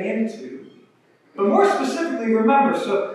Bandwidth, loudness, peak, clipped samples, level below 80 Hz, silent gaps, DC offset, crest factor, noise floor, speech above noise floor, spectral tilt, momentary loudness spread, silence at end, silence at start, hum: 12 kHz; -20 LUFS; -4 dBFS; under 0.1%; -86 dBFS; none; under 0.1%; 16 dB; -57 dBFS; 38 dB; -5.5 dB/octave; 20 LU; 0 s; 0 s; none